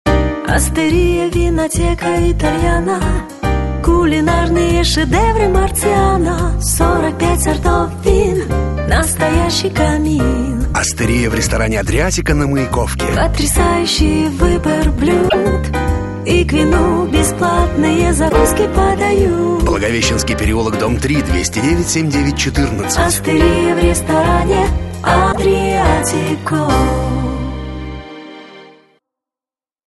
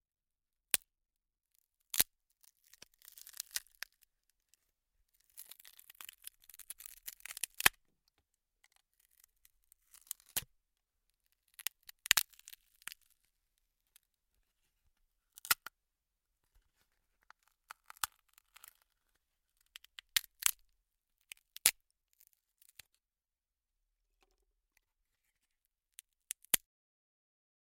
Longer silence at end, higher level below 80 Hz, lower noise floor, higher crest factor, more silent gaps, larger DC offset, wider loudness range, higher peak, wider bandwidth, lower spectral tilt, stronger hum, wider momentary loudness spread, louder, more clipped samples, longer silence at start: about the same, 1.2 s vs 1.1 s; first, -20 dBFS vs -72 dBFS; about the same, under -90 dBFS vs under -90 dBFS; second, 14 dB vs 44 dB; neither; first, 0.2% vs under 0.1%; second, 2 LU vs 13 LU; about the same, 0 dBFS vs -2 dBFS; second, 12.5 kHz vs 16.5 kHz; first, -5 dB/octave vs 1.5 dB/octave; neither; second, 5 LU vs 27 LU; first, -14 LUFS vs -35 LUFS; neither; second, 0.05 s vs 1.95 s